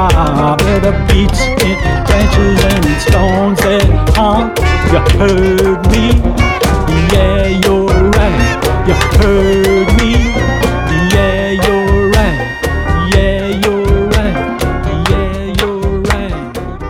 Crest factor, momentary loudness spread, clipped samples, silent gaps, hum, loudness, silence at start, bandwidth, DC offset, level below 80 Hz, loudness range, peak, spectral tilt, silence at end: 10 dB; 5 LU; under 0.1%; none; none; -11 LUFS; 0 s; 17 kHz; under 0.1%; -16 dBFS; 3 LU; 0 dBFS; -6 dB/octave; 0 s